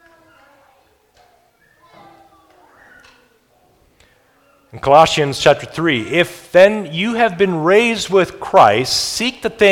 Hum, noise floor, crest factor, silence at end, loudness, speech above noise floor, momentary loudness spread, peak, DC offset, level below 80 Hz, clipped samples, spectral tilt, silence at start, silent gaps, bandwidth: none; -56 dBFS; 16 dB; 0 s; -14 LUFS; 42 dB; 8 LU; 0 dBFS; under 0.1%; -50 dBFS; 0.1%; -4 dB/octave; 4.75 s; none; 17 kHz